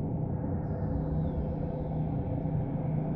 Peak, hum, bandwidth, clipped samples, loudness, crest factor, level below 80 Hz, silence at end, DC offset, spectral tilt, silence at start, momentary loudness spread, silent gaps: -20 dBFS; none; 3.7 kHz; under 0.1%; -33 LUFS; 12 dB; -40 dBFS; 0 s; under 0.1%; -13 dB/octave; 0 s; 2 LU; none